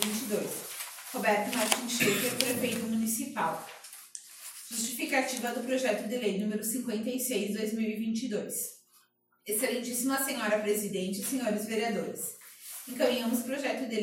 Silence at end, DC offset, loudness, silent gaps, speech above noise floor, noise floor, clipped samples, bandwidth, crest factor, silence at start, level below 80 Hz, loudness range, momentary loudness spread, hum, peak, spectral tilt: 0 s; under 0.1%; -31 LUFS; none; 36 dB; -67 dBFS; under 0.1%; 16.5 kHz; 28 dB; 0 s; -78 dBFS; 3 LU; 12 LU; 60 Hz at -60 dBFS; -4 dBFS; -3 dB/octave